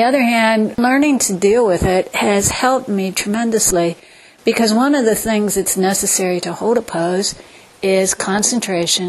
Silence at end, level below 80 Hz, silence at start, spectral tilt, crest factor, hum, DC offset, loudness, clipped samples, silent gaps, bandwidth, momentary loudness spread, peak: 0 s; -42 dBFS; 0 s; -3.5 dB/octave; 16 dB; none; under 0.1%; -15 LUFS; under 0.1%; none; 13 kHz; 6 LU; 0 dBFS